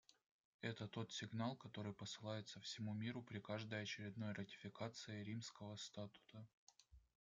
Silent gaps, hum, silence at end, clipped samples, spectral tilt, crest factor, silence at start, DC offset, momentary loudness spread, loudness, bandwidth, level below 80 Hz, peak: 0.31-0.59 s, 6.54-6.67 s; none; 0.25 s; under 0.1%; -5 dB/octave; 22 dB; 0.1 s; under 0.1%; 8 LU; -51 LUFS; 9.2 kHz; -82 dBFS; -30 dBFS